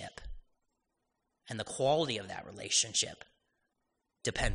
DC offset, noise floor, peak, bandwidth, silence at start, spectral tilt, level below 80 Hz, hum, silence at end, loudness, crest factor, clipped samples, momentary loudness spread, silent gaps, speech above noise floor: under 0.1%; -83 dBFS; -16 dBFS; 10.5 kHz; 0 s; -2 dB/octave; -50 dBFS; none; 0 s; -33 LUFS; 20 dB; under 0.1%; 17 LU; none; 50 dB